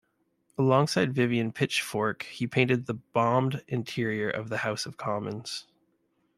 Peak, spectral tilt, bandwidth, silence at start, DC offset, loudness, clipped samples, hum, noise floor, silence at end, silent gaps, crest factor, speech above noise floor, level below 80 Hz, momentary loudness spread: -8 dBFS; -5.5 dB/octave; 15 kHz; 0.6 s; under 0.1%; -28 LUFS; under 0.1%; none; -72 dBFS; 0.75 s; none; 20 dB; 44 dB; -68 dBFS; 9 LU